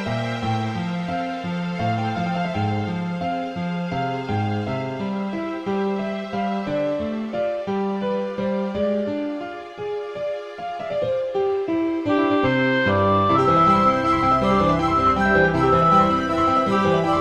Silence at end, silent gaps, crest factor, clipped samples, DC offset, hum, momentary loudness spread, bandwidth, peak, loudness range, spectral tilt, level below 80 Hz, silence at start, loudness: 0 s; none; 16 dB; under 0.1%; under 0.1%; none; 10 LU; 10 kHz; -4 dBFS; 8 LU; -7 dB/octave; -44 dBFS; 0 s; -21 LUFS